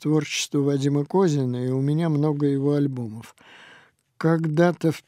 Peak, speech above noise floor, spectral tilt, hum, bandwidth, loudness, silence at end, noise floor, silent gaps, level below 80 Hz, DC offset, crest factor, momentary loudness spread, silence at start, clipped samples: -6 dBFS; 32 dB; -6.5 dB/octave; none; 13.5 kHz; -23 LUFS; 0.05 s; -54 dBFS; none; -70 dBFS; under 0.1%; 16 dB; 6 LU; 0 s; under 0.1%